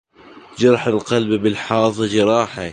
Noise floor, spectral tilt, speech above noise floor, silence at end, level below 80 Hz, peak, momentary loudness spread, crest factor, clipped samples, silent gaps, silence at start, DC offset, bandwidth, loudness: -43 dBFS; -5.5 dB/octave; 26 dB; 0 s; -52 dBFS; -2 dBFS; 4 LU; 16 dB; under 0.1%; none; 0.3 s; under 0.1%; 10 kHz; -17 LUFS